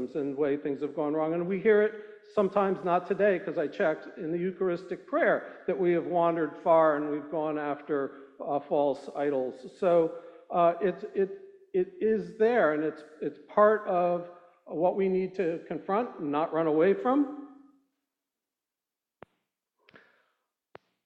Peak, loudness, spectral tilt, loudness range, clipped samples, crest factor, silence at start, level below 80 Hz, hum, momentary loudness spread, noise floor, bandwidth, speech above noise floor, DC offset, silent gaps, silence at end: -10 dBFS; -28 LUFS; -8.5 dB/octave; 3 LU; under 0.1%; 20 dB; 0 s; -76 dBFS; none; 10 LU; under -90 dBFS; 7.8 kHz; over 62 dB; under 0.1%; none; 3.5 s